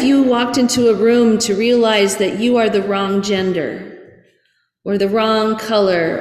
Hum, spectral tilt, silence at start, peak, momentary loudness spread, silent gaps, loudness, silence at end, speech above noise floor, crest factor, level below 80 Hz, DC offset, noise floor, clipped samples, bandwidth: none; -4.5 dB/octave; 0 s; -4 dBFS; 9 LU; none; -15 LUFS; 0 s; 48 dB; 12 dB; -54 dBFS; under 0.1%; -63 dBFS; under 0.1%; 15.5 kHz